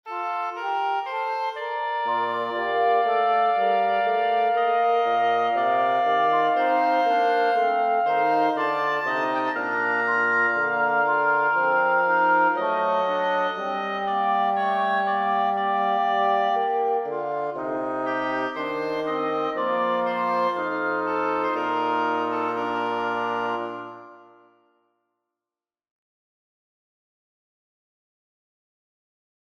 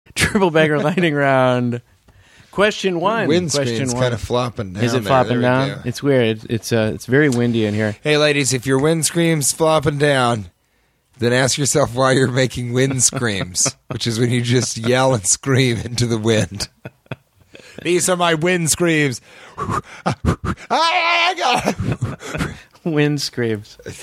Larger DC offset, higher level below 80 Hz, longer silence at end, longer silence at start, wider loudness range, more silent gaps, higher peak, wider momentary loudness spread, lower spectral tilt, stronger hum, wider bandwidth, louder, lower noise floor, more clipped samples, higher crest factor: neither; second, -70 dBFS vs -44 dBFS; first, 5.35 s vs 0 s; about the same, 0.05 s vs 0.15 s; about the same, 5 LU vs 3 LU; neither; second, -10 dBFS vs 0 dBFS; second, 7 LU vs 10 LU; first, -5.5 dB/octave vs -4 dB/octave; neither; second, 6.6 kHz vs 15.5 kHz; second, -23 LUFS vs -17 LUFS; first, under -90 dBFS vs -62 dBFS; neither; about the same, 14 dB vs 18 dB